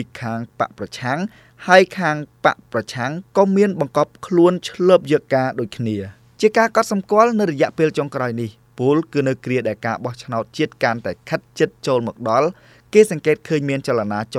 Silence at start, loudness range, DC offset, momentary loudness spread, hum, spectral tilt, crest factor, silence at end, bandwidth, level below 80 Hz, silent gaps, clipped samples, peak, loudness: 0 s; 4 LU; under 0.1%; 11 LU; none; -6 dB/octave; 18 dB; 0 s; 14.5 kHz; -60 dBFS; none; under 0.1%; 0 dBFS; -19 LUFS